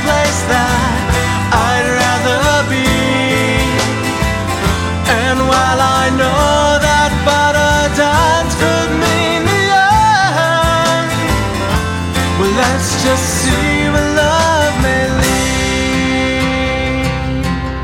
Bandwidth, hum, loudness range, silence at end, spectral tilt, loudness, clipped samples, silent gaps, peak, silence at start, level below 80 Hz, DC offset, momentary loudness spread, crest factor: 16.5 kHz; none; 2 LU; 0 s; -4 dB/octave; -13 LUFS; under 0.1%; none; 0 dBFS; 0 s; -24 dBFS; under 0.1%; 5 LU; 12 dB